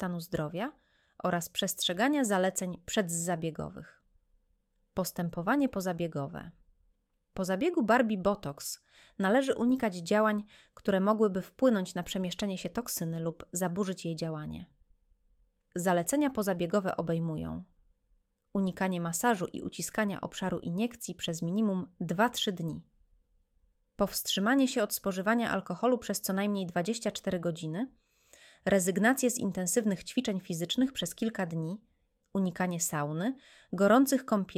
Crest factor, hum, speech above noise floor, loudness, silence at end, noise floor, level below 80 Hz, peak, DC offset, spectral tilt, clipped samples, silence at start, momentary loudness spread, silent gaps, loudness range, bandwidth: 20 dB; none; 43 dB; -31 LUFS; 0.05 s; -74 dBFS; -62 dBFS; -12 dBFS; under 0.1%; -4.5 dB/octave; under 0.1%; 0 s; 11 LU; none; 5 LU; 17 kHz